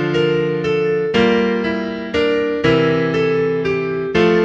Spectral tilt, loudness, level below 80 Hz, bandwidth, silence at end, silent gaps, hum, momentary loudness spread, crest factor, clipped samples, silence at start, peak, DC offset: -7 dB/octave; -17 LUFS; -44 dBFS; 7.4 kHz; 0 s; none; none; 5 LU; 14 dB; under 0.1%; 0 s; -2 dBFS; under 0.1%